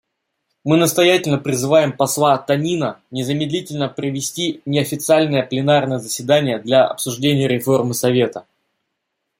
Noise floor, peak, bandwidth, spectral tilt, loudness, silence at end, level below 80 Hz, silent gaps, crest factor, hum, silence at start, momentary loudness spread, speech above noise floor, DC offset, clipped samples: -75 dBFS; -2 dBFS; 16.5 kHz; -5 dB/octave; -17 LUFS; 1 s; -60 dBFS; none; 16 dB; none; 0.65 s; 8 LU; 58 dB; under 0.1%; under 0.1%